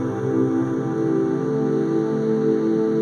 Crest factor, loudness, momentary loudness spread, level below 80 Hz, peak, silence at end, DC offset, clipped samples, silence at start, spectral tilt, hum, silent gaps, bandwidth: 12 dB; -21 LUFS; 3 LU; -60 dBFS; -8 dBFS; 0 s; under 0.1%; under 0.1%; 0 s; -9 dB/octave; none; none; 7 kHz